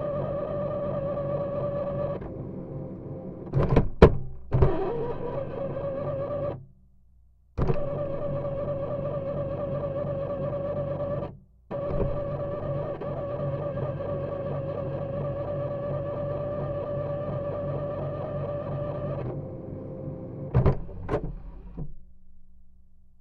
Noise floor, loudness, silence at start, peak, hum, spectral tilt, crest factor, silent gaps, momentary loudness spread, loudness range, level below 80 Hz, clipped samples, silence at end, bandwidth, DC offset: -57 dBFS; -30 LUFS; 0 s; 0 dBFS; none; -10 dB/octave; 28 dB; none; 12 LU; 6 LU; -38 dBFS; under 0.1%; 0.15 s; 6 kHz; under 0.1%